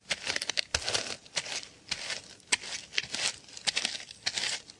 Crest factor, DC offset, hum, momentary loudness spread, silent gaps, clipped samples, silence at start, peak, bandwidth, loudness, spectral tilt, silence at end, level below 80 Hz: 30 dB; under 0.1%; none; 7 LU; none; under 0.1%; 0.05 s; -6 dBFS; 11.5 kHz; -32 LUFS; 0.5 dB/octave; 0 s; -62 dBFS